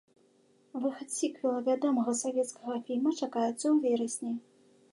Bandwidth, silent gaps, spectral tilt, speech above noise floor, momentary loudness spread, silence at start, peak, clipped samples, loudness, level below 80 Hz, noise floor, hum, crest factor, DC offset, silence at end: 11.5 kHz; none; -4 dB/octave; 35 dB; 8 LU; 0.75 s; -18 dBFS; under 0.1%; -31 LUFS; -88 dBFS; -66 dBFS; none; 14 dB; under 0.1%; 0.55 s